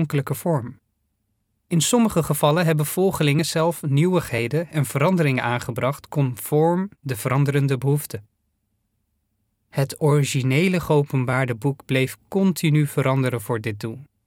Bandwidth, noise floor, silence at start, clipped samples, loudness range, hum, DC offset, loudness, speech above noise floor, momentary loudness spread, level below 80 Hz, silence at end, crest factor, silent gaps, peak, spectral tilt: 17.5 kHz; -72 dBFS; 0 s; under 0.1%; 4 LU; none; under 0.1%; -21 LUFS; 51 dB; 7 LU; -56 dBFS; 0.25 s; 18 dB; none; -4 dBFS; -6 dB/octave